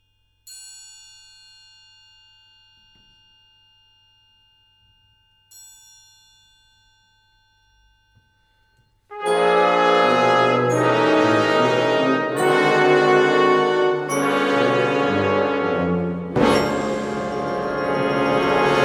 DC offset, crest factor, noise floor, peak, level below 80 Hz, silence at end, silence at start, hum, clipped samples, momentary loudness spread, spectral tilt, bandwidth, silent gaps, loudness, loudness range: under 0.1%; 16 dB; -62 dBFS; -4 dBFS; -54 dBFS; 0 s; 0.45 s; none; under 0.1%; 9 LU; -5 dB/octave; 14.5 kHz; none; -18 LUFS; 4 LU